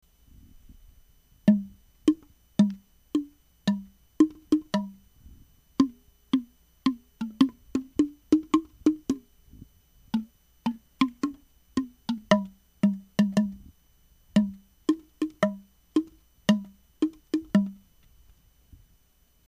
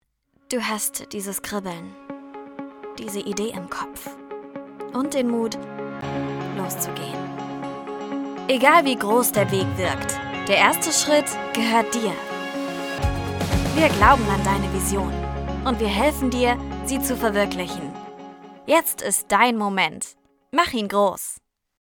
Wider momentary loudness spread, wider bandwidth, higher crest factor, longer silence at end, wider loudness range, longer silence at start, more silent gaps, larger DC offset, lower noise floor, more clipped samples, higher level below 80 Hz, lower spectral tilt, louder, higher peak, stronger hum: second, 10 LU vs 19 LU; second, 13 kHz vs over 20 kHz; about the same, 24 dB vs 22 dB; first, 1.75 s vs 0.45 s; second, 3 LU vs 9 LU; first, 1.45 s vs 0.5 s; neither; neither; about the same, -64 dBFS vs -64 dBFS; neither; second, -58 dBFS vs -38 dBFS; first, -6.5 dB/octave vs -4 dB/octave; second, -28 LUFS vs -22 LUFS; second, -6 dBFS vs 0 dBFS; neither